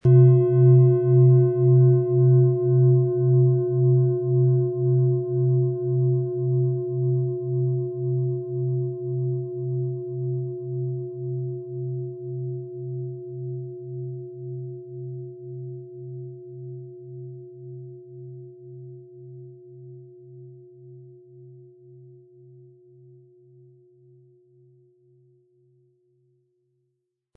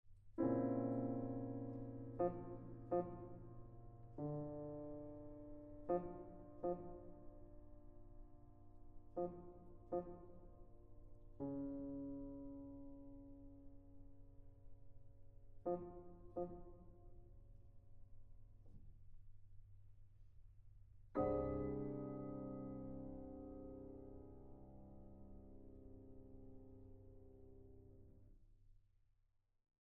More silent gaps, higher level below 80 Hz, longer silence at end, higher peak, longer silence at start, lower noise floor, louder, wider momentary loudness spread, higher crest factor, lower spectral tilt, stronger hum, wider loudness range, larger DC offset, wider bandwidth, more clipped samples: neither; second, -68 dBFS vs -62 dBFS; first, 5.85 s vs 1.05 s; first, -6 dBFS vs -28 dBFS; about the same, 0.05 s vs 0.05 s; about the same, -78 dBFS vs -77 dBFS; first, -22 LUFS vs -48 LUFS; about the same, 24 LU vs 24 LU; about the same, 18 dB vs 22 dB; first, -15 dB/octave vs -8 dB/octave; neither; first, 24 LU vs 17 LU; neither; second, 1.6 kHz vs 2.8 kHz; neither